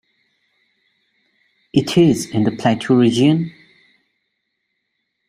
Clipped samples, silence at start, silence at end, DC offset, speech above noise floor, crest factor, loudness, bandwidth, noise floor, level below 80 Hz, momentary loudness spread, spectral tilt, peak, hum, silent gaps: under 0.1%; 1.75 s; 1.8 s; under 0.1%; 58 dB; 18 dB; -16 LUFS; 14 kHz; -73 dBFS; -56 dBFS; 7 LU; -6.5 dB/octave; -2 dBFS; none; none